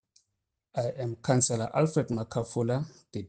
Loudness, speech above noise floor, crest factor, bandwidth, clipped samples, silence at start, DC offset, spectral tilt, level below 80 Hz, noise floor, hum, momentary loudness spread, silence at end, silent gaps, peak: -30 LUFS; 54 dB; 18 dB; 10 kHz; under 0.1%; 0.75 s; under 0.1%; -5.5 dB/octave; -64 dBFS; -83 dBFS; none; 8 LU; 0 s; none; -12 dBFS